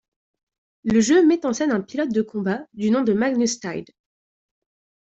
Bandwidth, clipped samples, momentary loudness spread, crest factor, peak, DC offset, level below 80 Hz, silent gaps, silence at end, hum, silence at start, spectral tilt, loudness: 8.2 kHz; under 0.1%; 12 LU; 16 dB; -6 dBFS; under 0.1%; -60 dBFS; none; 1.2 s; none; 0.85 s; -5 dB/octave; -21 LUFS